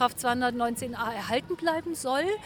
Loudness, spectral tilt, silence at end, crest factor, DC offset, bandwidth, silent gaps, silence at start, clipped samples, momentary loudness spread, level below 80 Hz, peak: -29 LUFS; -3.5 dB/octave; 0 s; 18 dB; under 0.1%; over 20 kHz; none; 0 s; under 0.1%; 5 LU; -58 dBFS; -10 dBFS